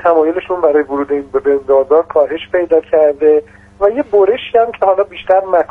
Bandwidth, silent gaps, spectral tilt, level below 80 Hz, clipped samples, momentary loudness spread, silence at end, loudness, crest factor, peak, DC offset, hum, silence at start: 3.8 kHz; none; -7 dB/octave; -48 dBFS; under 0.1%; 5 LU; 0.05 s; -13 LUFS; 12 dB; 0 dBFS; under 0.1%; 50 Hz at -50 dBFS; 0 s